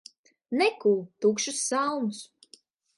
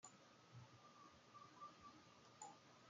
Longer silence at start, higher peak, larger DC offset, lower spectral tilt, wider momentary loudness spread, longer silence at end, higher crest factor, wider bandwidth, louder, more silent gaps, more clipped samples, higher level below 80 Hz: first, 0.5 s vs 0 s; first, -10 dBFS vs -44 dBFS; neither; about the same, -3 dB/octave vs -3 dB/octave; first, 10 LU vs 6 LU; first, 0.75 s vs 0 s; about the same, 18 dB vs 22 dB; first, 11.5 kHz vs 9 kHz; first, -27 LUFS vs -64 LUFS; neither; neither; first, -82 dBFS vs under -90 dBFS